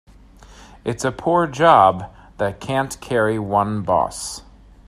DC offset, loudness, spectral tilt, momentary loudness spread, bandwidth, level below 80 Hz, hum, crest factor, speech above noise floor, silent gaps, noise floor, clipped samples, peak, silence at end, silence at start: under 0.1%; -19 LUFS; -5 dB/octave; 17 LU; 14.5 kHz; -46 dBFS; none; 20 dB; 27 dB; none; -45 dBFS; under 0.1%; 0 dBFS; 0.45 s; 0.5 s